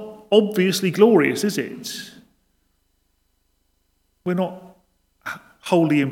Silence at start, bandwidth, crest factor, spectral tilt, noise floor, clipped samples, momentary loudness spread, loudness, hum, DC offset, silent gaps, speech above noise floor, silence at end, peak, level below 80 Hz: 0 s; 17.5 kHz; 20 dB; -5.5 dB/octave; -67 dBFS; under 0.1%; 19 LU; -20 LUFS; none; under 0.1%; none; 49 dB; 0 s; -2 dBFS; -68 dBFS